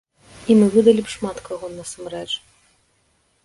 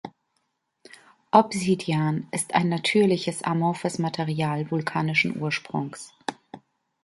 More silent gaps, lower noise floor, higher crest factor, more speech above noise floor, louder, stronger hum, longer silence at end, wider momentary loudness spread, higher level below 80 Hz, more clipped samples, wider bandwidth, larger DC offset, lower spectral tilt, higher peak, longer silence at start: neither; second, -64 dBFS vs -75 dBFS; about the same, 20 dB vs 22 dB; second, 45 dB vs 51 dB; first, -19 LUFS vs -24 LUFS; neither; first, 1.05 s vs 0.45 s; first, 18 LU vs 13 LU; first, -54 dBFS vs -66 dBFS; neither; about the same, 11.5 kHz vs 11.5 kHz; neither; about the same, -5.5 dB/octave vs -5.5 dB/octave; about the same, -2 dBFS vs -2 dBFS; first, 0.4 s vs 0.05 s